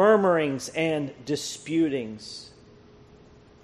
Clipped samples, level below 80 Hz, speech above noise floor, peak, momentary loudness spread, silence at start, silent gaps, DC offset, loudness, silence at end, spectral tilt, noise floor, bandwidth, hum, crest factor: under 0.1%; -62 dBFS; 25 dB; -6 dBFS; 18 LU; 0 s; none; under 0.1%; -26 LUFS; 1.15 s; -5 dB/octave; -52 dBFS; 13 kHz; none; 20 dB